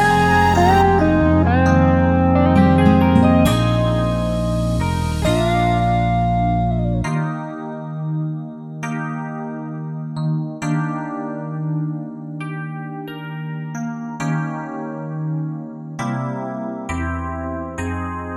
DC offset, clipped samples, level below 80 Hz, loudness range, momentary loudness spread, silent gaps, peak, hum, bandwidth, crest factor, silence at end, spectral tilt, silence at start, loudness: under 0.1%; under 0.1%; -32 dBFS; 12 LU; 15 LU; none; 0 dBFS; none; 14.5 kHz; 18 dB; 0 s; -7 dB/octave; 0 s; -19 LUFS